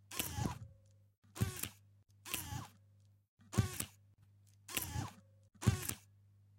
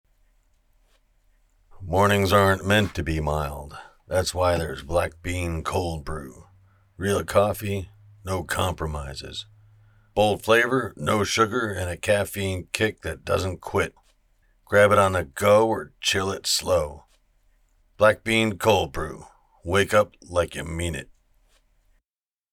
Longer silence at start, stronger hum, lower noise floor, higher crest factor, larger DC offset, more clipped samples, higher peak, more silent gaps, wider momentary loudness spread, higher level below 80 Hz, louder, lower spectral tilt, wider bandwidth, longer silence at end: second, 0.1 s vs 1.75 s; first, 50 Hz at -65 dBFS vs none; second, -68 dBFS vs under -90 dBFS; about the same, 26 dB vs 22 dB; neither; neither; second, -16 dBFS vs -2 dBFS; first, 1.18-1.22 s, 3.28-3.37 s vs none; first, 18 LU vs 15 LU; second, -58 dBFS vs -46 dBFS; second, -41 LUFS vs -23 LUFS; about the same, -4 dB/octave vs -4.5 dB/octave; second, 17 kHz vs 19 kHz; second, 0.6 s vs 1.5 s